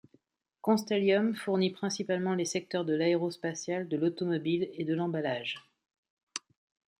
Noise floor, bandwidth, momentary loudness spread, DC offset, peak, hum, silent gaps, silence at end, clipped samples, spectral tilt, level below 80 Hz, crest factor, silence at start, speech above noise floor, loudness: -69 dBFS; 16 kHz; 10 LU; under 0.1%; -14 dBFS; none; 5.98-6.03 s, 6.10-6.17 s, 6.23-6.27 s; 0.6 s; under 0.1%; -5 dB/octave; -78 dBFS; 18 dB; 0.65 s; 39 dB; -31 LUFS